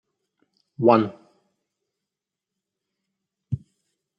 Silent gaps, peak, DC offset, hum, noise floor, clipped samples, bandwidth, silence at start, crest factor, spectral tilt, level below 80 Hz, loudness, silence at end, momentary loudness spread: none; -2 dBFS; under 0.1%; none; -87 dBFS; under 0.1%; 5.6 kHz; 0.8 s; 26 dB; -9.5 dB/octave; -64 dBFS; -23 LUFS; 0.6 s; 15 LU